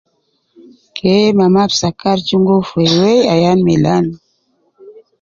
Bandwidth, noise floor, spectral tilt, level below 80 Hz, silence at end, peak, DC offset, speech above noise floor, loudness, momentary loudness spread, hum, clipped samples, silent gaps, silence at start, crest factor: 7.4 kHz; -63 dBFS; -6 dB/octave; -48 dBFS; 0.3 s; 0 dBFS; under 0.1%; 51 dB; -12 LUFS; 6 LU; none; under 0.1%; none; 0.95 s; 12 dB